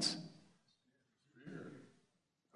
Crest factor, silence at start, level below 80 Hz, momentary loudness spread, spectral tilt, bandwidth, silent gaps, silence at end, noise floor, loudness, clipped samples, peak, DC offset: 28 dB; 0 s; under -90 dBFS; 22 LU; -2.5 dB/octave; 11 kHz; none; 0.65 s; -82 dBFS; -47 LUFS; under 0.1%; -22 dBFS; under 0.1%